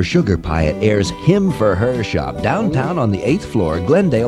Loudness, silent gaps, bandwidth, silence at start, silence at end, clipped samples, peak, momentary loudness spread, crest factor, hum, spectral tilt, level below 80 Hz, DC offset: -17 LUFS; none; 12.5 kHz; 0 s; 0 s; under 0.1%; 0 dBFS; 4 LU; 14 dB; none; -7 dB/octave; -32 dBFS; under 0.1%